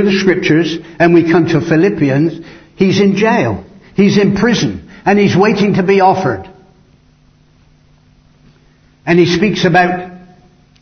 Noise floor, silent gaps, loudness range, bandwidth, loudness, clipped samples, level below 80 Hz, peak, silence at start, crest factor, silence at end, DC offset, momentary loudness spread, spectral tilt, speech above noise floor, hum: -48 dBFS; none; 6 LU; 6.6 kHz; -12 LUFS; under 0.1%; -44 dBFS; 0 dBFS; 0 s; 12 dB; 0.65 s; under 0.1%; 9 LU; -6.5 dB/octave; 38 dB; none